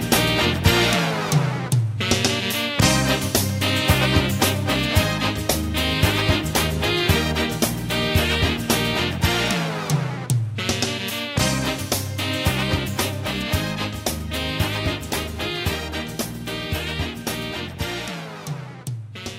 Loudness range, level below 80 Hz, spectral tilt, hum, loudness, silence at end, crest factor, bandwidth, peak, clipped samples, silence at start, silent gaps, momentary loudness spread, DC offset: 7 LU; -34 dBFS; -4 dB/octave; none; -21 LUFS; 0 s; 20 dB; 16.5 kHz; -2 dBFS; under 0.1%; 0 s; none; 10 LU; under 0.1%